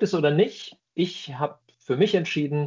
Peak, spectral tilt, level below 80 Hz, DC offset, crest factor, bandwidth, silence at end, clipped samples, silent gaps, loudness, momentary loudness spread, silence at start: -8 dBFS; -6.5 dB/octave; -70 dBFS; under 0.1%; 16 dB; 7.6 kHz; 0 s; under 0.1%; none; -25 LUFS; 10 LU; 0 s